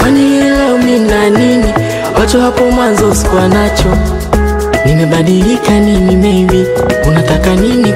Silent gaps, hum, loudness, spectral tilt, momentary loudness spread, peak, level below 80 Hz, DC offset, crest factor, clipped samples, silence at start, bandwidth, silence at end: none; none; -9 LUFS; -6 dB/octave; 4 LU; 0 dBFS; -18 dBFS; under 0.1%; 8 dB; under 0.1%; 0 s; 16 kHz; 0 s